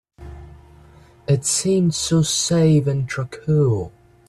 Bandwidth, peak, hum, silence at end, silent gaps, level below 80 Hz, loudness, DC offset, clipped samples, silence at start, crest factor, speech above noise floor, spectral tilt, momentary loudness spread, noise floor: 13.5 kHz; -6 dBFS; none; 0.4 s; none; -46 dBFS; -19 LUFS; under 0.1%; under 0.1%; 0.2 s; 14 dB; 29 dB; -5 dB/octave; 18 LU; -48 dBFS